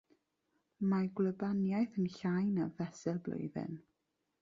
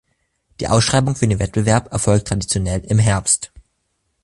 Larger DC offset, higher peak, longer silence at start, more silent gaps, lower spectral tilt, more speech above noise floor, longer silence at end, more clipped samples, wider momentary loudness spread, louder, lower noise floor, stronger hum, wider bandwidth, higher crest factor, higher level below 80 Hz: neither; second, -22 dBFS vs -2 dBFS; first, 0.8 s vs 0.6 s; neither; first, -8.5 dB/octave vs -4.5 dB/octave; second, 49 dB vs 53 dB; second, 0.6 s vs 0.75 s; neither; first, 8 LU vs 5 LU; second, -37 LUFS vs -17 LUFS; first, -85 dBFS vs -69 dBFS; neither; second, 7.4 kHz vs 11.5 kHz; about the same, 14 dB vs 16 dB; second, -74 dBFS vs -36 dBFS